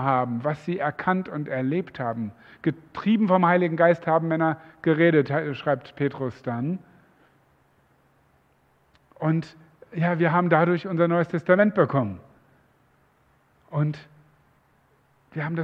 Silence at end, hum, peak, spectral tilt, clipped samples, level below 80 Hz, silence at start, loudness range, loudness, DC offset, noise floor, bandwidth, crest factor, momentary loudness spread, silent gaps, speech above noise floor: 0 s; none; -4 dBFS; -9.5 dB/octave; under 0.1%; -68 dBFS; 0 s; 12 LU; -24 LUFS; under 0.1%; -63 dBFS; 6 kHz; 22 dB; 12 LU; none; 40 dB